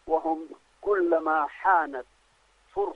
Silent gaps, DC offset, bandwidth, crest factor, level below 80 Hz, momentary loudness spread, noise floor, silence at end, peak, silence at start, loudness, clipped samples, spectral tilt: none; under 0.1%; 8.4 kHz; 18 dB; -62 dBFS; 13 LU; -64 dBFS; 0 s; -10 dBFS; 0.05 s; -26 LUFS; under 0.1%; -6 dB/octave